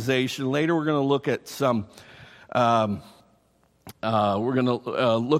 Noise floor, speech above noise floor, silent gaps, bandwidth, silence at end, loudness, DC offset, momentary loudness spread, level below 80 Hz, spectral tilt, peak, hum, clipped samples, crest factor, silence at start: -64 dBFS; 40 dB; none; 16 kHz; 0 s; -24 LUFS; under 0.1%; 8 LU; -64 dBFS; -6 dB/octave; -6 dBFS; none; under 0.1%; 18 dB; 0 s